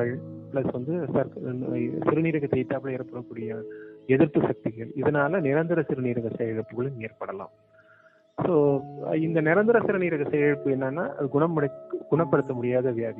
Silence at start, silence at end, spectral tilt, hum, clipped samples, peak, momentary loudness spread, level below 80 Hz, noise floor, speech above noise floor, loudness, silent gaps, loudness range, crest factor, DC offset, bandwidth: 0 s; 0 s; -11 dB/octave; none; under 0.1%; -6 dBFS; 13 LU; -62 dBFS; -58 dBFS; 32 dB; -26 LUFS; none; 4 LU; 18 dB; under 0.1%; 4 kHz